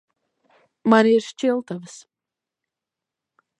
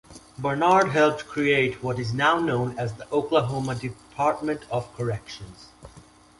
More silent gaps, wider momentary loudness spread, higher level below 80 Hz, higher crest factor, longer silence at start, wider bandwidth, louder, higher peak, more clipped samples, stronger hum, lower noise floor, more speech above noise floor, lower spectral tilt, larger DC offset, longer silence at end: neither; first, 19 LU vs 13 LU; second, -80 dBFS vs -54 dBFS; about the same, 22 dB vs 20 dB; first, 0.85 s vs 0.1 s; second, 9.2 kHz vs 11.5 kHz; first, -19 LUFS vs -24 LUFS; first, -2 dBFS vs -6 dBFS; neither; neither; first, -87 dBFS vs -51 dBFS; first, 68 dB vs 27 dB; about the same, -5.5 dB/octave vs -6 dB/octave; neither; first, 1.75 s vs 0.4 s